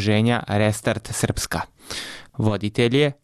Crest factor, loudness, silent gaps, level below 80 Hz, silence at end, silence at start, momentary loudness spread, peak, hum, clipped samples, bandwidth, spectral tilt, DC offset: 14 dB; -23 LUFS; none; -44 dBFS; 0.1 s; 0 s; 12 LU; -8 dBFS; none; under 0.1%; 14.5 kHz; -5 dB/octave; under 0.1%